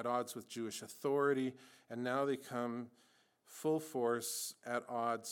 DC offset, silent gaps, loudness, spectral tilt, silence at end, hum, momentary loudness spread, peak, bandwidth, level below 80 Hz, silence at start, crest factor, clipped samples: under 0.1%; none; -39 LUFS; -4 dB/octave; 0 s; none; 10 LU; -22 dBFS; 18 kHz; under -90 dBFS; 0 s; 16 dB; under 0.1%